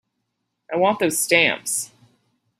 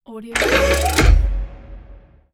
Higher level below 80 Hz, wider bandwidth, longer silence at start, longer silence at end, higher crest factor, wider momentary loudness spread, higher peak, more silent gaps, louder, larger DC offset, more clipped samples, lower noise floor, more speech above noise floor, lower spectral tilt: second, -68 dBFS vs -20 dBFS; about the same, 16 kHz vs 16.5 kHz; first, 0.7 s vs 0.1 s; first, 0.75 s vs 0.4 s; about the same, 20 dB vs 16 dB; about the same, 11 LU vs 13 LU; about the same, -2 dBFS vs -2 dBFS; neither; about the same, -19 LUFS vs -17 LUFS; neither; neither; first, -76 dBFS vs -43 dBFS; first, 56 dB vs 28 dB; second, -2 dB/octave vs -4.5 dB/octave